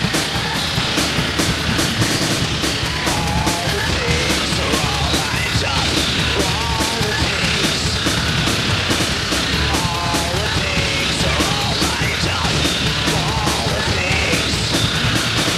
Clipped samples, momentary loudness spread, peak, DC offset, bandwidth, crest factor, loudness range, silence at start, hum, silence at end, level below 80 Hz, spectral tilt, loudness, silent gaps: under 0.1%; 2 LU; -2 dBFS; under 0.1%; 16 kHz; 16 dB; 1 LU; 0 s; none; 0 s; -30 dBFS; -3.5 dB/octave; -17 LUFS; none